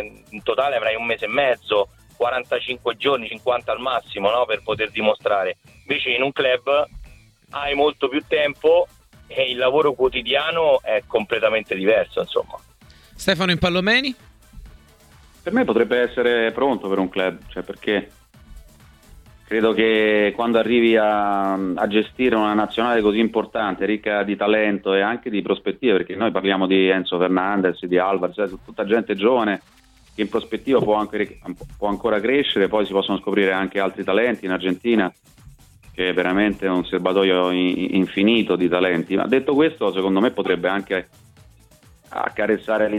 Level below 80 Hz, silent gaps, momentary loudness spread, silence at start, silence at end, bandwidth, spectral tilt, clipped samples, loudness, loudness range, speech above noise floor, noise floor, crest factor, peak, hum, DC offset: -50 dBFS; none; 8 LU; 0 s; 0 s; 14 kHz; -6 dB/octave; under 0.1%; -20 LUFS; 3 LU; 31 dB; -51 dBFS; 18 dB; -4 dBFS; none; under 0.1%